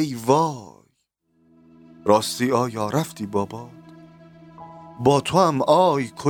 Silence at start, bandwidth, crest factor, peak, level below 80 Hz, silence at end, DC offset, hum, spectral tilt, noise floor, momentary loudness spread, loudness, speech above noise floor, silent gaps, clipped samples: 0 s; 19 kHz; 20 dB; -2 dBFS; -62 dBFS; 0 s; under 0.1%; none; -5.5 dB/octave; -70 dBFS; 20 LU; -21 LUFS; 49 dB; none; under 0.1%